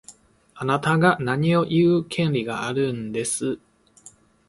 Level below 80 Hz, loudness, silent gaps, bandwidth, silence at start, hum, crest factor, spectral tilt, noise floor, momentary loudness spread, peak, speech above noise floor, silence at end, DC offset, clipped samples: -58 dBFS; -22 LUFS; none; 11.5 kHz; 0.1 s; none; 20 dB; -5.5 dB/octave; -51 dBFS; 8 LU; -2 dBFS; 30 dB; 0.4 s; under 0.1%; under 0.1%